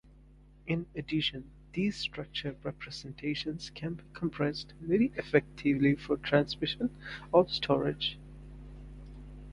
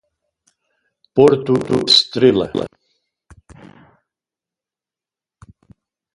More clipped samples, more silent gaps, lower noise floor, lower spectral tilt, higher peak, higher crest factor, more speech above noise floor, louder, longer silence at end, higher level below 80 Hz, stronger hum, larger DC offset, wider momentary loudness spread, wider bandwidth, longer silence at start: neither; neither; second, -57 dBFS vs -89 dBFS; first, -6.5 dB/octave vs -5 dB/octave; second, -10 dBFS vs 0 dBFS; about the same, 24 dB vs 20 dB; second, 25 dB vs 75 dB; second, -32 LUFS vs -14 LUFS; second, 0 s vs 3.45 s; about the same, -54 dBFS vs -52 dBFS; first, 50 Hz at -50 dBFS vs none; neither; first, 22 LU vs 12 LU; about the same, 11 kHz vs 11.5 kHz; second, 0.65 s vs 1.15 s